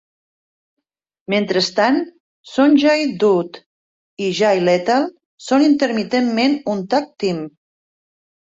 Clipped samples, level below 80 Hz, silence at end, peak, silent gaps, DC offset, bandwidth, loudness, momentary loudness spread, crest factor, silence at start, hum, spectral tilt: under 0.1%; -64 dBFS; 0.95 s; -4 dBFS; 2.20-2.44 s, 3.66-4.17 s, 5.26-5.38 s; under 0.1%; 7.8 kHz; -17 LUFS; 12 LU; 16 dB; 1.3 s; none; -5 dB/octave